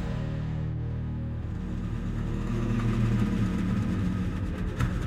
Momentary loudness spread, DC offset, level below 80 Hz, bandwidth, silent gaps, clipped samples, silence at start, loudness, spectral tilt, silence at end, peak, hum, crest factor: 7 LU; under 0.1%; -36 dBFS; 10.5 kHz; none; under 0.1%; 0 s; -30 LUFS; -8 dB/octave; 0 s; -12 dBFS; none; 18 dB